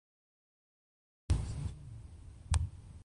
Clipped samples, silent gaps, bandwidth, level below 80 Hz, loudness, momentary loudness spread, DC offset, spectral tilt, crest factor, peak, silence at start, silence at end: under 0.1%; none; 11 kHz; -42 dBFS; -38 LUFS; 16 LU; under 0.1%; -5.5 dB/octave; 26 dB; -14 dBFS; 1.3 s; 0 s